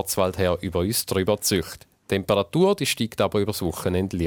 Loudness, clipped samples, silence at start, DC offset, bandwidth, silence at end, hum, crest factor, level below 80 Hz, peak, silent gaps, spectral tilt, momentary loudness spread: -23 LUFS; under 0.1%; 0 s; under 0.1%; 18 kHz; 0 s; none; 18 dB; -48 dBFS; -6 dBFS; none; -4.5 dB/octave; 6 LU